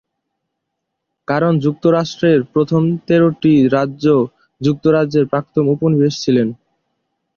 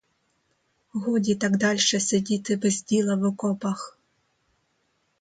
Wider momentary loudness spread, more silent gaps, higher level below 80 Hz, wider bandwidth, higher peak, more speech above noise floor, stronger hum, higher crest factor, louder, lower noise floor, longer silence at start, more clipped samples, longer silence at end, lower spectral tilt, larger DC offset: second, 6 LU vs 10 LU; neither; first, -54 dBFS vs -66 dBFS; second, 7.2 kHz vs 9.4 kHz; first, -2 dBFS vs -10 dBFS; first, 62 dB vs 47 dB; neither; about the same, 14 dB vs 16 dB; first, -15 LUFS vs -24 LUFS; first, -76 dBFS vs -71 dBFS; first, 1.3 s vs 0.95 s; neither; second, 0.8 s vs 1.3 s; first, -7.5 dB/octave vs -4 dB/octave; neither